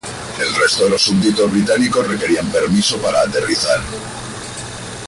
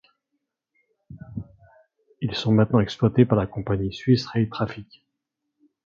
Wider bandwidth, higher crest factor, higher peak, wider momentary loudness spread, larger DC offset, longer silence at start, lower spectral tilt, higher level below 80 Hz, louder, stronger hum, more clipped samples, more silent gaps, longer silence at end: first, 11.5 kHz vs 7.4 kHz; second, 14 dB vs 22 dB; about the same, -2 dBFS vs -4 dBFS; second, 14 LU vs 19 LU; neither; second, 0.05 s vs 1.1 s; second, -3.5 dB/octave vs -8 dB/octave; first, -42 dBFS vs -50 dBFS; first, -15 LUFS vs -23 LUFS; neither; neither; neither; second, 0 s vs 1 s